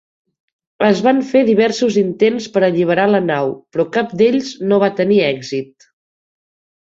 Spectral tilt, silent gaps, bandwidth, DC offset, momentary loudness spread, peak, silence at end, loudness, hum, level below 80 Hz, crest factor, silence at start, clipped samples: -6 dB/octave; none; 7.8 kHz; under 0.1%; 7 LU; -2 dBFS; 1.25 s; -15 LUFS; none; -60 dBFS; 14 dB; 0.8 s; under 0.1%